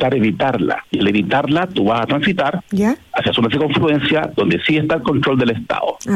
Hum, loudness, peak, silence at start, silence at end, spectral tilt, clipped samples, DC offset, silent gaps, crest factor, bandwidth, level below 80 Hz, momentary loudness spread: none; -17 LUFS; -4 dBFS; 0 s; 0 s; -6.5 dB/octave; under 0.1%; under 0.1%; none; 12 dB; 13.5 kHz; -48 dBFS; 4 LU